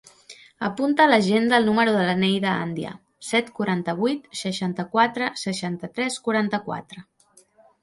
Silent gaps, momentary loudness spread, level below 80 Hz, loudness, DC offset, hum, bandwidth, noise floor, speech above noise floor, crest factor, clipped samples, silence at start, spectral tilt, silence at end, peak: none; 12 LU; -64 dBFS; -22 LUFS; under 0.1%; none; 11.5 kHz; -57 dBFS; 35 dB; 20 dB; under 0.1%; 0.3 s; -5 dB/octave; 0.8 s; -2 dBFS